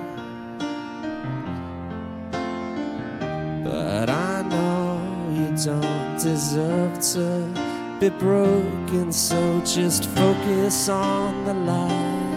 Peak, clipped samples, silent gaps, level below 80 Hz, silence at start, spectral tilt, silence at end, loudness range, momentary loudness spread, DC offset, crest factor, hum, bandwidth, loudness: -6 dBFS; under 0.1%; none; -52 dBFS; 0 s; -5 dB/octave; 0 s; 8 LU; 11 LU; under 0.1%; 18 dB; none; 16.5 kHz; -23 LUFS